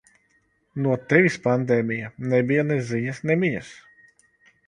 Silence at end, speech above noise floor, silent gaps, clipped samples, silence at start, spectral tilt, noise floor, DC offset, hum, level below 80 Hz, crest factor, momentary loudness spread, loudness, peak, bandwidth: 0.95 s; 44 dB; none; under 0.1%; 0.75 s; -7.5 dB/octave; -66 dBFS; under 0.1%; none; -62 dBFS; 22 dB; 10 LU; -23 LUFS; -2 dBFS; 10.5 kHz